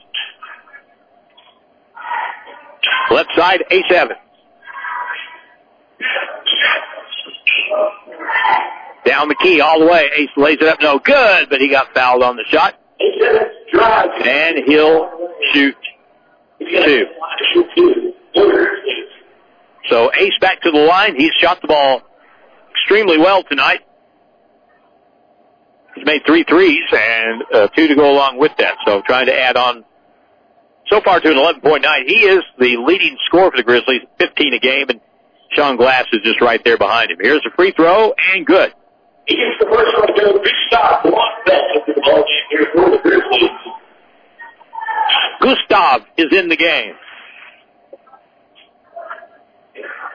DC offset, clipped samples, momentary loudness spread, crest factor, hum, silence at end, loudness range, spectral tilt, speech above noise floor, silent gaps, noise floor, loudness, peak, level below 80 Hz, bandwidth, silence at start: under 0.1%; under 0.1%; 12 LU; 14 dB; none; 0 s; 5 LU; -5 dB/octave; 41 dB; none; -53 dBFS; -12 LUFS; 0 dBFS; -52 dBFS; 5.4 kHz; 0.15 s